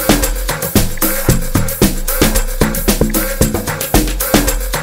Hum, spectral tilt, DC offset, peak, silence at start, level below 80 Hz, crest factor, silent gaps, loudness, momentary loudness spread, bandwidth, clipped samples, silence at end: none; -4 dB/octave; under 0.1%; 0 dBFS; 0 s; -18 dBFS; 14 dB; none; -14 LUFS; 3 LU; 16.5 kHz; under 0.1%; 0 s